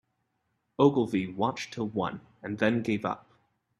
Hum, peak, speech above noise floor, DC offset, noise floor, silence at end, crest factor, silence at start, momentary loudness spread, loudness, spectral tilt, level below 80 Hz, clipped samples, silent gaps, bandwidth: none; -8 dBFS; 49 dB; under 0.1%; -77 dBFS; 0.65 s; 22 dB; 0.8 s; 15 LU; -29 LUFS; -6.5 dB/octave; -66 dBFS; under 0.1%; none; 11.5 kHz